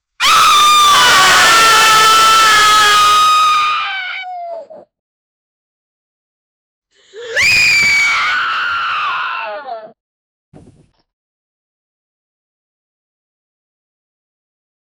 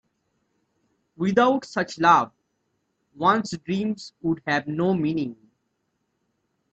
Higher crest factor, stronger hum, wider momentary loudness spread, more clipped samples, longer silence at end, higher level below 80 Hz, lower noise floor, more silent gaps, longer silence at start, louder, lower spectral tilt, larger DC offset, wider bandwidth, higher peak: second, 14 dB vs 20 dB; neither; first, 17 LU vs 11 LU; neither; first, 5.1 s vs 1.4 s; first, -48 dBFS vs -64 dBFS; second, -48 dBFS vs -75 dBFS; first, 4.99-6.82 s vs none; second, 0.2 s vs 1.2 s; first, -8 LUFS vs -23 LUFS; second, 1 dB/octave vs -6 dB/octave; neither; first, over 20 kHz vs 8.4 kHz; first, 0 dBFS vs -4 dBFS